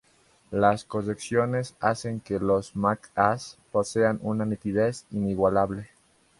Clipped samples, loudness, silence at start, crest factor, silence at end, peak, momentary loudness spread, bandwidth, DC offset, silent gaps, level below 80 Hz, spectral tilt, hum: under 0.1%; -26 LUFS; 0.5 s; 22 dB; 0.55 s; -4 dBFS; 7 LU; 11.5 kHz; under 0.1%; none; -54 dBFS; -6.5 dB/octave; none